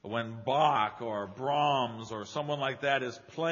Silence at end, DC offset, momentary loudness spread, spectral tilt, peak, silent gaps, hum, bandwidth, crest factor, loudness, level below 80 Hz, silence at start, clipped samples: 0 s; under 0.1%; 10 LU; -3 dB/octave; -14 dBFS; none; none; 7.2 kHz; 18 dB; -31 LUFS; -74 dBFS; 0.05 s; under 0.1%